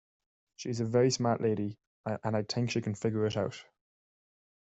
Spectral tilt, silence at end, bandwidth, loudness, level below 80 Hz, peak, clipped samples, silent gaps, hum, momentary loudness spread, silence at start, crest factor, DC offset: -6 dB/octave; 1.05 s; 8.2 kHz; -32 LUFS; -70 dBFS; -14 dBFS; under 0.1%; 1.87-2.04 s; none; 12 LU; 0.6 s; 18 dB; under 0.1%